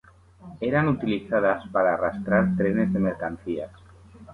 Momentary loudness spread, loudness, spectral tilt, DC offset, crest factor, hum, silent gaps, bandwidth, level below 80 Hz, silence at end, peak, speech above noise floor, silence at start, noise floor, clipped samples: 9 LU; -24 LUFS; -9 dB/octave; under 0.1%; 18 dB; none; none; 4.3 kHz; -52 dBFS; 0 s; -8 dBFS; 25 dB; 0.4 s; -48 dBFS; under 0.1%